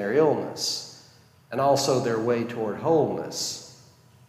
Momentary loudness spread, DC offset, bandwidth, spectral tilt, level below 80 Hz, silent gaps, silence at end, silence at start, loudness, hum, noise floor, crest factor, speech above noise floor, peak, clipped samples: 10 LU; under 0.1%; 15.5 kHz; -4.5 dB/octave; -70 dBFS; none; 0.55 s; 0 s; -25 LUFS; none; -55 dBFS; 16 dB; 31 dB; -10 dBFS; under 0.1%